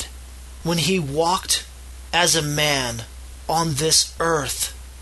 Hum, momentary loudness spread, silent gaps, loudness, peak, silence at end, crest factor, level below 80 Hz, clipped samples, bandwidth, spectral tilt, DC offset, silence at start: none; 20 LU; none; -20 LUFS; -4 dBFS; 0 s; 20 dB; -40 dBFS; under 0.1%; 12.5 kHz; -2.5 dB/octave; under 0.1%; 0 s